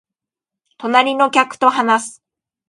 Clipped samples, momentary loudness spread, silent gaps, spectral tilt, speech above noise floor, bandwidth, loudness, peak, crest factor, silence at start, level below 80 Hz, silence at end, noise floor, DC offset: under 0.1%; 10 LU; none; -2.5 dB/octave; 71 dB; 11.5 kHz; -15 LUFS; 0 dBFS; 18 dB; 0.8 s; -72 dBFS; 0.6 s; -86 dBFS; under 0.1%